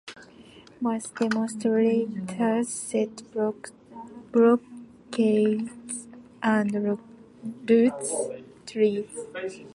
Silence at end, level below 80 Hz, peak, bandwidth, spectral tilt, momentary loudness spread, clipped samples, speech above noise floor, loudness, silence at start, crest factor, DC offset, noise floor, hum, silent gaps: 0.05 s; -70 dBFS; -8 dBFS; 11.5 kHz; -5.5 dB/octave; 20 LU; under 0.1%; 25 dB; -26 LUFS; 0.05 s; 18 dB; under 0.1%; -50 dBFS; none; none